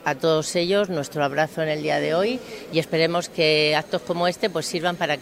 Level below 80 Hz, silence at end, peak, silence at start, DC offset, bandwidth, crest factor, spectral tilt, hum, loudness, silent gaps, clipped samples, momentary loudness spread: -62 dBFS; 0 s; -4 dBFS; 0 s; under 0.1%; 16 kHz; 18 dB; -4 dB/octave; none; -22 LUFS; none; under 0.1%; 6 LU